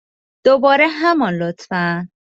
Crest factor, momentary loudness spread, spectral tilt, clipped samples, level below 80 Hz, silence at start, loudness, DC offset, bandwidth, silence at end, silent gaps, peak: 14 dB; 9 LU; -6.5 dB/octave; under 0.1%; -60 dBFS; 0.45 s; -16 LUFS; under 0.1%; 7.8 kHz; 0.25 s; none; -2 dBFS